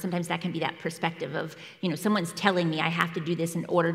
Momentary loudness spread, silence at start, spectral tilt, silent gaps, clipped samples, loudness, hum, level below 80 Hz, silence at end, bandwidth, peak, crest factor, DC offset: 8 LU; 0 s; -5.5 dB/octave; none; under 0.1%; -28 LUFS; none; -74 dBFS; 0 s; 16 kHz; -4 dBFS; 24 dB; under 0.1%